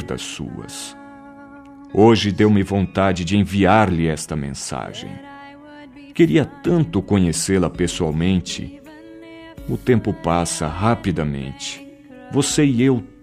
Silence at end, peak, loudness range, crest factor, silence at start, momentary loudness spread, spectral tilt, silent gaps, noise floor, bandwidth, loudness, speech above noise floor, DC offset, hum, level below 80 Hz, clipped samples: 0.15 s; 0 dBFS; 5 LU; 18 dB; 0 s; 20 LU; -5.5 dB/octave; none; -40 dBFS; 15 kHz; -19 LUFS; 22 dB; under 0.1%; none; -42 dBFS; under 0.1%